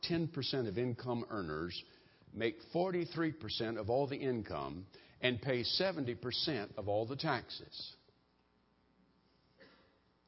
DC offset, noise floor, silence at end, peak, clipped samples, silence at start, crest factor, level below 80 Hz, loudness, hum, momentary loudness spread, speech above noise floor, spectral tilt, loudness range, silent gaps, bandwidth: under 0.1%; -74 dBFS; 0.6 s; -16 dBFS; under 0.1%; 0.05 s; 24 dB; -64 dBFS; -38 LUFS; none; 12 LU; 36 dB; -8.5 dB/octave; 5 LU; none; 5.8 kHz